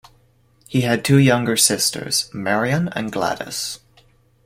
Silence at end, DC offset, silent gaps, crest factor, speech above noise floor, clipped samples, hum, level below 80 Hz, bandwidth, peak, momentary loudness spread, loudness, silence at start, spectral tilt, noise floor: 0.7 s; under 0.1%; none; 20 dB; 38 dB; under 0.1%; none; -54 dBFS; 16.5 kHz; 0 dBFS; 11 LU; -19 LUFS; 0.7 s; -4 dB/octave; -57 dBFS